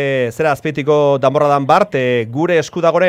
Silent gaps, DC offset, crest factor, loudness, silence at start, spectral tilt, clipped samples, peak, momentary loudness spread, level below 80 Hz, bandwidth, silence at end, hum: none; under 0.1%; 14 dB; -14 LUFS; 0 s; -6 dB/octave; under 0.1%; 0 dBFS; 4 LU; -56 dBFS; 15 kHz; 0 s; none